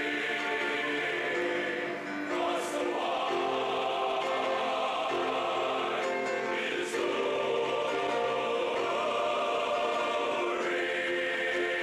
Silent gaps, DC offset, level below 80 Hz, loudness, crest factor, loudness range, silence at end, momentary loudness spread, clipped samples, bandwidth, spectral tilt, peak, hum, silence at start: none; under 0.1%; -70 dBFS; -30 LUFS; 10 dB; 1 LU; 0 s; 2 LU; under 0.1%; 14.5 kHz; -3 dB/octave; -20 dBFS; none; 0 s